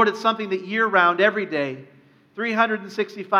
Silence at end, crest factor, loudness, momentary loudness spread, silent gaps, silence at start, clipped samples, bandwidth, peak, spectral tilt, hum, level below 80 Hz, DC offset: 0 s; 20 dB; -21 LUFS; 12 LU; none; 0 s; under 0.1%; 13 kHz; -2 dBFS; -5 dB/octave; none; -82 dBFS; under 0.1%